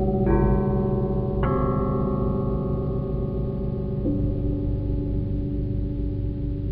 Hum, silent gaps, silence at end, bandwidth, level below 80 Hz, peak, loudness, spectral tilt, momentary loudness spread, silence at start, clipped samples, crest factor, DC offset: 50 Hz at -35 dBFS; none; 0 s; 4.2 kHz; -30 dBFS; -8 dBFS; -25 LUFS; -12.5 dB/octave; 6 LU; 0 s; under 0.1%; 16 dB; under 0.1%